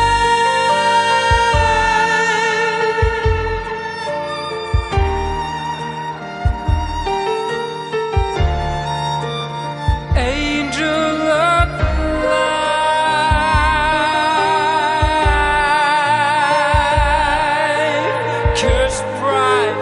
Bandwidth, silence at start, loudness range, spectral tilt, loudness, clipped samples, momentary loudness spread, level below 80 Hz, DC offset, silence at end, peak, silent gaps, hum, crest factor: 11 kHz; 0 s; 6 LU; -4.5 dB/octave; -16 LUFS; under 0.1%; 9 LU; -26 dBFS; under 0.1%; 0 s; -2 dBFS; none; none; 14 dB